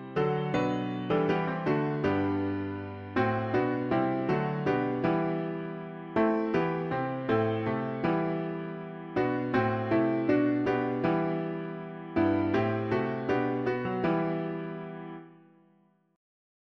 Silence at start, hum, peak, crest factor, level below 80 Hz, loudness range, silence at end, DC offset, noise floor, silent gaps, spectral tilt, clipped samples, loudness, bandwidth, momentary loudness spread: 0 s; none; -12 dBFS; 16 dB; -60 dBFS; 2 LU; 1.4 s; under 0.1%; -66 dBFS; none; -9 dB/octave; under 0.1%; -29 LUFS; 7 kHz; 10 LU